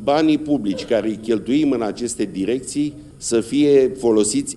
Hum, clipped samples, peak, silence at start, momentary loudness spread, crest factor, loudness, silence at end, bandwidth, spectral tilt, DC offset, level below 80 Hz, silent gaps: none; under 0.1%; -4 dBFS; 0 s; 9 LU; 14 dB; -19 LUFS; 0 s; 12 kHz; -4.5 dB/octave; under 0.1%; -50 dBFS; none